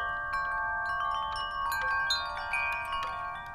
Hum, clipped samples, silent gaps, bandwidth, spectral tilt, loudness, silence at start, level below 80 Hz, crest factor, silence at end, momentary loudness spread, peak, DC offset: none; under 0.1%; none; 16.5 kHz; -1 dB/octave; -31 LUFS; 0 s; -52 dBFS; 16 dB; 0 s; 5 LU; -16 dBFS; under 0.1%